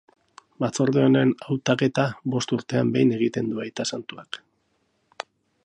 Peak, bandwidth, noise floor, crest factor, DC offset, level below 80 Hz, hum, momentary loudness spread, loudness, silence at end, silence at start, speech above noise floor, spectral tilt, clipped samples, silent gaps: -6 dBFS; 10 kHz; -70 dBFS; 18 dB; under 0.1%; -66 dBFS; none; 19 LU; -23 LUFS; 0.45 s; 0.6 s; 47 dB; -6 dB/octave; under 0.1%; none